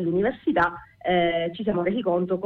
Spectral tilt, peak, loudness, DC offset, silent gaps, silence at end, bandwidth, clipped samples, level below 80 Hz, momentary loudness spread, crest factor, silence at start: -8.5 dB/octave; -10 dBFS; -24 LUFS; under 0.1%; none; 0 s; 4.7 kHz; under 0.1%; -52 dBFS; 4 LU; 14 dB; 0 s